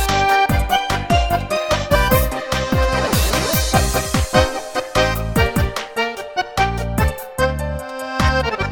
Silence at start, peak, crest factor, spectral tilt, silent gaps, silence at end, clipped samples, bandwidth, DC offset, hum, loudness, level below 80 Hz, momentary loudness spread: 0 s; 0 dBFS; 16 dB; -4.5 dB/octave; none; 0 s; under 0.1%; over 20 kHz; under 0.1%; none; -18 LUFS; -24 dBFS; 7 LU